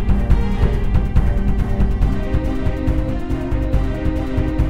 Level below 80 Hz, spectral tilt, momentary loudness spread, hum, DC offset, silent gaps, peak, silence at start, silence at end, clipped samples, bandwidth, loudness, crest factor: -18 dBFS; -8.5 dB/octave; 4 LU; none; 4%; none; 0 dBFS; 0 s; 0 s; under 0.1%; 7.2 kHz; -20 LUFS; 16 dB